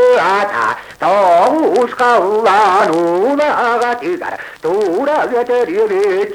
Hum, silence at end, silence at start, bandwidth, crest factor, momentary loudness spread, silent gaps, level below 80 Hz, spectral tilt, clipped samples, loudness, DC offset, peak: none; 0 s; 0 s; 16 kHz; 12 dB; 8 LU; none; -58 dBFS; -4.5 dB/octave; under 0.1%; -13 LUFS; under 0.1%; -2 dBFS